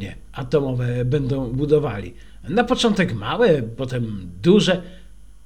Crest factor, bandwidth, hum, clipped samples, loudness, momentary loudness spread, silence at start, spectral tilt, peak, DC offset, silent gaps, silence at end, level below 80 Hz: 18 dB; 12 kHz; none; under 0.1%; -20 LUFS; 14 LU; 0 s; -6.5 dB/octave; -2 dBFS; 0.8%; none; 0.15 s; -42 dBFS